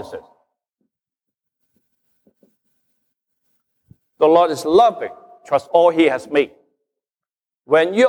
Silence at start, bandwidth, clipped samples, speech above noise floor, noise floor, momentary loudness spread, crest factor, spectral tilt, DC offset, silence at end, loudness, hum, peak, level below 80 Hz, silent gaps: 0 s; 13 kHz; under 0.1%; over 75 dB; under -90 dBFS; 17 LU; 18 dB; -5 dB/octave; under 0.1%; 0 s; -16 LUFS; none; -2 dBFS; -64 dBFS; none